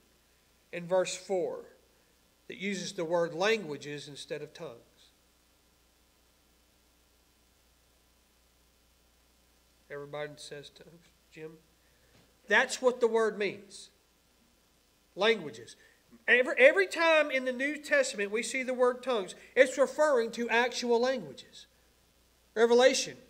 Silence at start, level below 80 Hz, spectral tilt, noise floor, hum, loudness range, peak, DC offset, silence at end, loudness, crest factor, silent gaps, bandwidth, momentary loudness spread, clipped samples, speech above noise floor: 0.75 s; -72 dBFS; -3 dB/octave; -67 dBFS; none; 20 LU; -6 dBFS; under 0.1%; 0.1 s; -29 LUFS; 26 dB; none; 16 kHz; 22 LU; under 0.1%; 38 dB